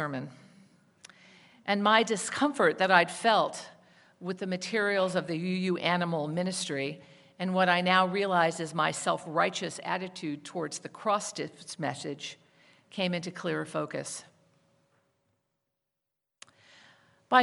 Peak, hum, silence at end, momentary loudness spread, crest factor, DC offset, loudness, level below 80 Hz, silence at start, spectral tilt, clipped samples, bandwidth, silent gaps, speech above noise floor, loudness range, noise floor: -6 dBFS; none; 0 s; 15 LU; 24 dB; under 0.1%; -29 LUFS; -80 dBFS; 0 s; -4 dB/octave; under 0.1%; 11.5 kHz; none; 57 dB; 10 LU; -86 dBFS